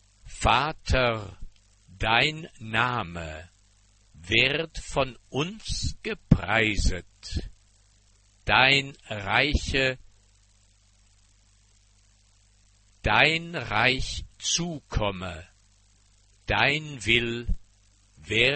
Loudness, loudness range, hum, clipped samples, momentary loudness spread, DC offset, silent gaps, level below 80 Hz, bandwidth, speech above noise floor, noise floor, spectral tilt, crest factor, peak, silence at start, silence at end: -25 LUFS; 4 LU; 50 Hz at -60 dBFS; under 0.1%; 16 LU; under 0.1%; none; -38 dBFS; 8.8 kHz; 35 dB; -61 dBFS; -3.5 dB/octave; 26 dB; -2 dBFS; 0.25 s; 0 s